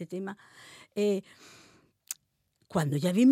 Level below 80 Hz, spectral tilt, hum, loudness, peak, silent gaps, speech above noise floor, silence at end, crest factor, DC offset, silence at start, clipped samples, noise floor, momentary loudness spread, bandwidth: -72 dBFS; -6.5 dB/octave; none; -31 LUFS; -14 dBFS; none; 45 dB; 0 s; 16 dB; under 0.1%; 0 s; under 0.1%; -74 dBFS; 23 LU; 16.5 kHz